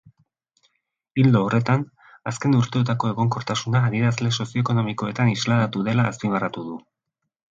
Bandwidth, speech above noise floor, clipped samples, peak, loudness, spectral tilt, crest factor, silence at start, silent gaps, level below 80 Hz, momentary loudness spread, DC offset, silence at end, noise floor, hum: 7.8 kHz; 49 dB; under 0.1%; -4 dBFS; -22 LUFS; -6.5 dB/octave; 18 dB; 1.15 s; none; -58 dBFS; 11 LU; under 0.1%; 0.8 s; -70 dBFS; none